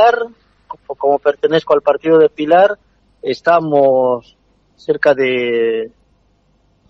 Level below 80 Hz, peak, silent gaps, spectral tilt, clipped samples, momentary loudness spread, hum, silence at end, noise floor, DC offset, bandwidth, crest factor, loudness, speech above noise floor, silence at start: -58 dBFS; 0 dBFS; none; -6.5 dB/octave; under 0.1%; 17 LU; none; 1 s; -57 dBFS; under 0.1%; 6.6 kHz; 14 dB; -14 LUFS; 43 dB; 0 s